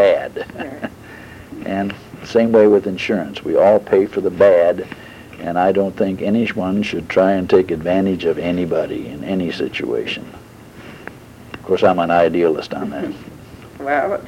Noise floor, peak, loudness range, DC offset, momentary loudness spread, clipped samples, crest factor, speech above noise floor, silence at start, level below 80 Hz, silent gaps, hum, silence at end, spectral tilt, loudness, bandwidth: -38 dBFS; -2 dBFS; 7 LU; under 0.1%; 22 LU; under 0.1%; 16 dB; 22 dB; 0 s; -50 dBFS; none; none; 0 s; -7 dB/octave; -17 LUFS; 16 kHz